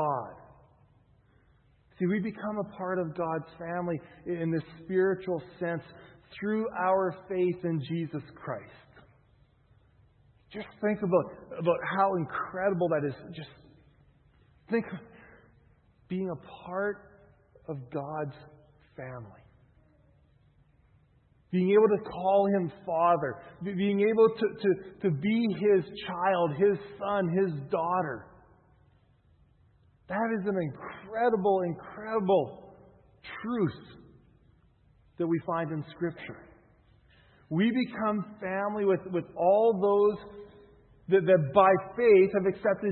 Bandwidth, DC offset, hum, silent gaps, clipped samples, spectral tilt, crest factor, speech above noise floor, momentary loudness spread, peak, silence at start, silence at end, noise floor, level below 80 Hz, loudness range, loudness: 4.4 kHz; under 0.1%; none; none; under 0.1%; -11 dB/octave; 24 dB; 36 dB; 18 LU; -6 dBFS; 0 s; 0 s; -64 dBFS; -66 dBFS; 12 LU; -29 LUFS